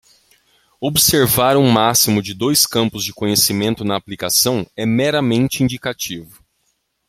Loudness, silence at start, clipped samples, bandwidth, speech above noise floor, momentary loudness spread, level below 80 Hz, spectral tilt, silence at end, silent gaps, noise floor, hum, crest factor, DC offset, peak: -16 LUFS; 0.8 s; under 0.1%; 16.5 kHz; 51 dB; 10 LU; -48 dBFS; -3.5 dB/octave; 0.85 s; none; -67 dBFS; none; 18 dB; under 0.1%; 0 dBFS